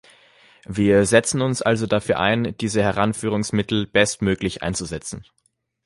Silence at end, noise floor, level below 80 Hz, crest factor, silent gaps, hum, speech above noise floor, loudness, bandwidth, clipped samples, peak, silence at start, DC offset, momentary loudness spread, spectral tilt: 0.65 s; -53 dBFS; -46 dBFS; 20 dB; none; none; 33 dB; -21 LUFS; 11.5 kHz; under 0.1%; -2 dBFS; 0.7 s; under 0.1%; 11 LU; -4.5 dB/octave